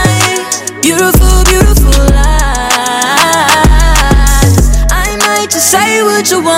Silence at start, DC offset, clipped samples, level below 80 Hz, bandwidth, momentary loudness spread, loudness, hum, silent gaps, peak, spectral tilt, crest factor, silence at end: 0 s; under 0.1%; 0.5%; -10 dBFS; 16.5 kHz; 4 LU; -8 LUFS; none; none; 0 dBFS; -3.5 dB/octave; 8 dB; 0 s